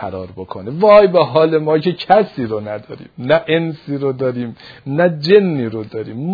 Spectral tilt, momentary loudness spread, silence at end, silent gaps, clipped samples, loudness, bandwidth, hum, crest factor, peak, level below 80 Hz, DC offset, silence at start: -8.5 dB/octave; 18 LU; 0 s; none; under 0.1%; -15 LUFS; 5 kHz; none; 16 dB; 0 dBFS; -54 dBFS; under 0.1%; 0 s